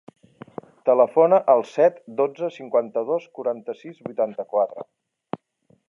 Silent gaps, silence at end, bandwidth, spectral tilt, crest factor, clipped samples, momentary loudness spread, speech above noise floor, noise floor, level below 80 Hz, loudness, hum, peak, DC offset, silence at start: none; 1.05 s; 7.2 kHz; -7.5 dB/octave; 20 dB; under 0.1%; 20 LU; 41 dB; -63 dBFS; -78 dBFS; -22 LUFS; none; -4 dBFS; under 0.1%; 0.85 s